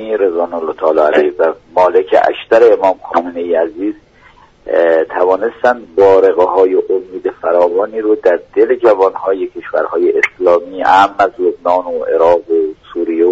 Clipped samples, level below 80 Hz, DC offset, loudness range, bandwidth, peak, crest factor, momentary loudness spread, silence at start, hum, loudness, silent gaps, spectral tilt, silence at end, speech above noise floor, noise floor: under 0.1%; -52 dBFS; under 0.1%; 2 LU; 7.8 kHz; 0 dBFS; 12 dB; 9 LU; 0 s; none; -12 LUFS; none; -5.5 dB/octave; 0 s; 32 dB; -44 dBFS